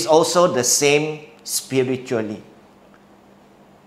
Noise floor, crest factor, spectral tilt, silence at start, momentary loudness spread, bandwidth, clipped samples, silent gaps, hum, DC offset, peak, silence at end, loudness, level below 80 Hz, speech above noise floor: -49 dBFS; 20 dB; -3 dB/octave; 0 s; 15 LU; 16 kHz; under 0.1%; none; none; under 0.1%; 0 dBFS; 1.45 s; -18 LUFS; -64 dBFS; 31 dB